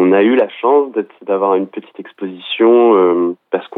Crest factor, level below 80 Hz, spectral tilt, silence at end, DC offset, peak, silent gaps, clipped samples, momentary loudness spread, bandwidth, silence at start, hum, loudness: 12 dB; -80 dBFS; -9 dB/octave; 0 s; under 0.1%; -2 dBFS; none; under 0.1%; 16 LU; 4 kHz; 0 s; none; -13 LUFS